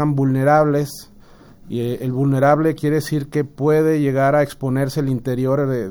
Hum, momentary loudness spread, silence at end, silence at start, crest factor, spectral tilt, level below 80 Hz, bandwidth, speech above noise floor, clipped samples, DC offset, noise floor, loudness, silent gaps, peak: none; 9 LU; 0 s; 0 s; 16 dB; -7.5 dB/octave; -48 dBFS; over 20 kHz; 27 dB; under 0.1%; under 0.1%; -44 dBFS; -18 LUFS; none; -2 dBFS